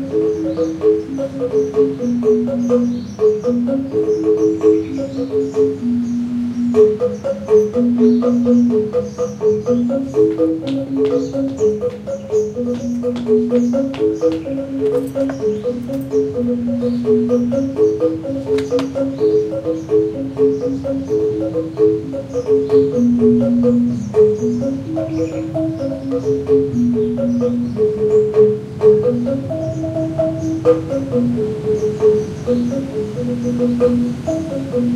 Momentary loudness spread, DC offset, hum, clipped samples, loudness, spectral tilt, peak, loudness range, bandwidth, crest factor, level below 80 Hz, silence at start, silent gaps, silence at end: 8 LU; under 0.1%; none; under 0.1%; -17 LUFS; -8 dB/octave; -2 dBFS; 3 LU; 9.2 kHz; 14 dB; -48 dBFS; 0 s; none; 0 s